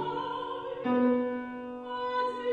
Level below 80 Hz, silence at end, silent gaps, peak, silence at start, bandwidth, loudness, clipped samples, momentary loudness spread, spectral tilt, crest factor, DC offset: -68 dBFS; 0 s; none; -16 dBFS; 0 s; 5.2 kHz; -31 LUFS; under 0.1%; 11 LU; -7 dB/octave; 16 dB; under 0.1%